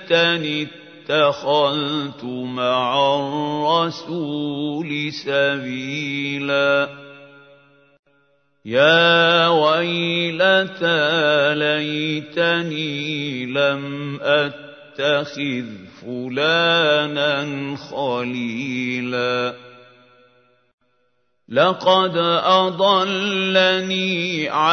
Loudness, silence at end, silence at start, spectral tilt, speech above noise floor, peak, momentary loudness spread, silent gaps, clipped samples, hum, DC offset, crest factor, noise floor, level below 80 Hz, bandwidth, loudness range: -19 LUFS; 0 s; 0 s; -5 dB/octave; 49 dB; -2 dBFS; 11 LU; 7.99-8.03 s, 20.73-20.78 s; under 0.1%; none; under 0.1%; 18 dB; -69 dBFS; -70 dBFS; 6.6 kHz; 7 LU